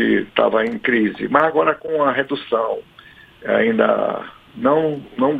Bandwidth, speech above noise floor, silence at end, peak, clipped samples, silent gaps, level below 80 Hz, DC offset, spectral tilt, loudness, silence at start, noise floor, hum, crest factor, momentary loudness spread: 4.9 kHz; 27 dB; 0 s; 0 dBFS; under 0.1%; none; -58 dBFS; under 0.1%; -7.5 dB/octave; -18 LUFS; 0 s; -45 dBFS; none; 18 dB; 8 LU